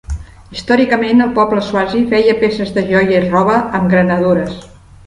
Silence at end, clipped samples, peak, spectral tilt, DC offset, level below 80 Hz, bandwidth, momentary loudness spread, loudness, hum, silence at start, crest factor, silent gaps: 0.4 s; under 0.1%; 0 dBFS; -7 dB/octave; under 0.1%; -36 dBFS; 11 kHz; 14 LU; -13 LUFS; none; 0.1 s; 14 dB; none